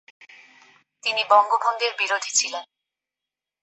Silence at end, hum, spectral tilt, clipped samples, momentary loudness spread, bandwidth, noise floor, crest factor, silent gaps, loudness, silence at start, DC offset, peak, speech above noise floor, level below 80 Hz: 1 s; none; 2.5 dB/octave; under 0.1%; 11 LU; 8.4 kHz; -88 dBFS; 22 dB; none; -21 LUFS; 1.05 s; under 0.1%; -4 dBFS; 66 dB; under -90 dBFS